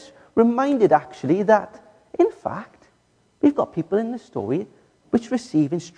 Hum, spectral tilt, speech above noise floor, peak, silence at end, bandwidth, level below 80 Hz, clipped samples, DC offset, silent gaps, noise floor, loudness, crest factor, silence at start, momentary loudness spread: none; -7.5 dB/octave; 42 dB; -4 dBFS; 0.1 s; 9.8 kHz; -62 dBFS; under 0.1%; under 0.1%; none; -62 dBFS; -21 LUFS; 18 dB; 0.35 s; 13 LU